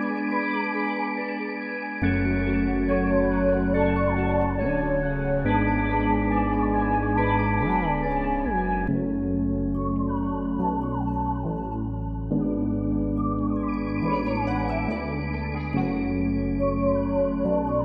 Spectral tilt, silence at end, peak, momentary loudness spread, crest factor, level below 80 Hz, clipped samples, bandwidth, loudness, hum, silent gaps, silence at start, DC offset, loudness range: -10.5 dB/octave; 0 s; -10 dBFS; 6 LU; 14 dB; -34 dBFS; under 0.1%; 5 kHz; -25 LUFS; none; none; 0 s; under 0.1%; 4 LU